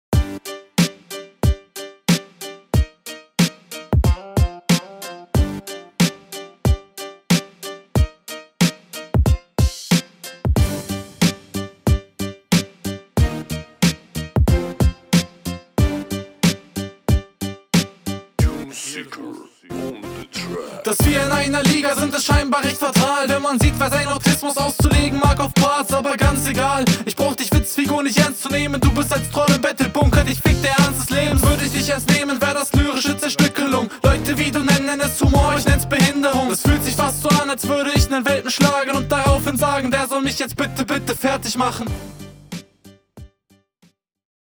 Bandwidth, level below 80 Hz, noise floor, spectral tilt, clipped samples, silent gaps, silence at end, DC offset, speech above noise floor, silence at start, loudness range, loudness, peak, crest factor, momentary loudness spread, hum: over 20 kHz; -28 dBFS; -59 dBFS; -4.5 dB/octave; under 0.1%; none; 1.15 s; under 0.1%; 41 dB; 0.1 s; 6 LU; -19 LUFS; 0 dBFS; 18 dB; 14 LU; none